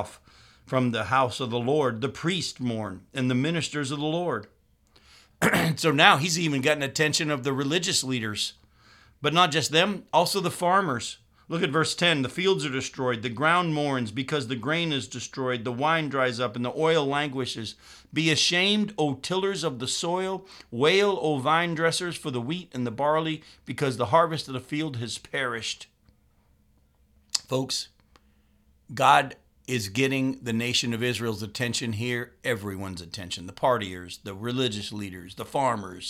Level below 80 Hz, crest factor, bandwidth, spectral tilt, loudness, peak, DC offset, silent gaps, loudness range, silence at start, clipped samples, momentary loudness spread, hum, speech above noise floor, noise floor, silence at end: -62 dBFS; 26 dB; 16.5 kHz; -4 dB/octave; -26 LUFS; 0 dBFS; under 0.1%; none; 6 LU; 0 s; under 0.1%; 12 LU; none; 37 dB; -63 dBFS; 0 s